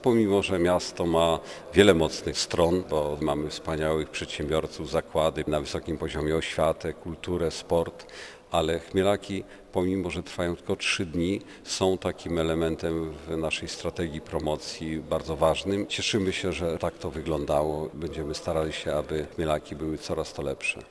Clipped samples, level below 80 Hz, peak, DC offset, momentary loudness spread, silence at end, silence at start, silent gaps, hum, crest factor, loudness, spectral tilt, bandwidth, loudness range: under 0.1%; -46 dBFS; -2 dBFS; under 0.1%; 9 LU; 0 s; 0 s; none; none; 24 dB; -28 LUFS; -5 dB/octave; 11 kHz; 5 LU